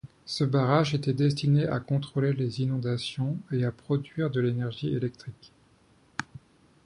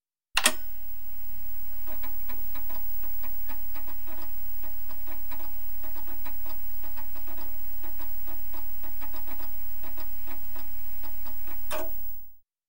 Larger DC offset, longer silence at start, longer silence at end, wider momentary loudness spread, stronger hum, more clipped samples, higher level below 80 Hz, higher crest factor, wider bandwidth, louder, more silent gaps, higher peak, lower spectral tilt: second, under 0.1% vs 8%; about the same, 0.05 s vs 0 s; first, 0.5 s vs 0 s; first, 14 LU vs 4 LU; neither; neither; about the same, -60 dBFS vs -60 dBFS; second, 20 dB vs 30 dB; second, 11 kHz vs 16.5 kHz; first, -28 LUFS vs -34 LUFS; neither; second, -8 dBFS vs -4 dBFS; first, -7 dB/octave vs -1.5 dB/octave